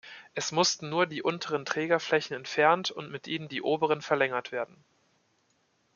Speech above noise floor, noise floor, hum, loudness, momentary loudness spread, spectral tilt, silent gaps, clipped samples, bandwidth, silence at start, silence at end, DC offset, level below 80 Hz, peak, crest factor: 42 dB; -71 dBFS; none; -29 LUFS; 11 LU; -3.5 dB/octave; none; under 0.1%; 7.4 kHz; 0.05 s; 1.3 s; under 0.1%; -78 dBFS; -8 dBFS; 22 dB